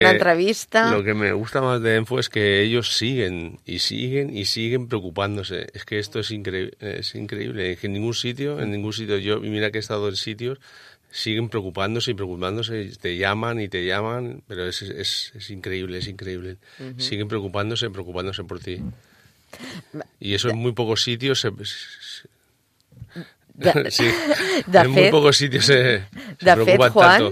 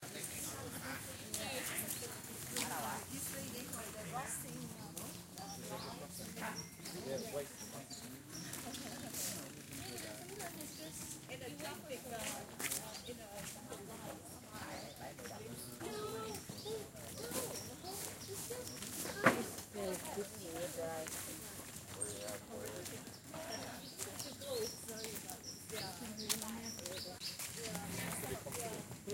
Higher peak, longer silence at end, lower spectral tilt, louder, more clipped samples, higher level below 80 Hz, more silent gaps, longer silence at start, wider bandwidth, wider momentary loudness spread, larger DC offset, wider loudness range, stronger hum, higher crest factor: first, 0 dBFS vs -14 dBFS; about the same, 0 s vs 0 s; first, -4.5 dB/octave vs -3 dB/octave; first, -21 LUFS vs -44 LUFS; neither; first, -56 dBFS vs -68 dBFS; neither; about the same, 0 s vs 0 s; about the same, 15.5 kHz vs 17 kHz; first, 18 LU vs 8 LU; neither; first, 11 LU vs 6 LU; neither; second, 22 dB vs 32 dB